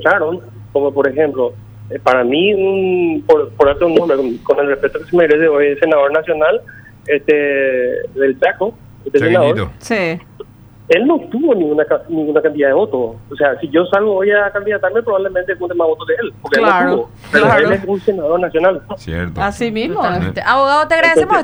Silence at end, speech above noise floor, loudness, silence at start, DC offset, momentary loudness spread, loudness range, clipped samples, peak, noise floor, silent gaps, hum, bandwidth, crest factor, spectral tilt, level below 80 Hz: 0 s; 23 dB; -14 LUFS; 0 s; under 0.1%; 8 LU; 2 LU; under 0.1%; 0 dBFS; -36 dBFS; none; none; over 20 kHz; 14 dB; -6 dB/octave; -44 dBFS